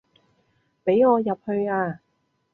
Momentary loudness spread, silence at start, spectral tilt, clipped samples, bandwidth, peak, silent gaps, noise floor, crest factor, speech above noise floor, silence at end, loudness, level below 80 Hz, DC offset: 12 LU; 0.85 s; -10 dB/octave; under 0.1%; 4.1 kHz; -8 dBFS; none; -71 dBFS; 18 dB; 50 dB; 0.6 s; -23 LUFS; -68 dBFS; under 0.1%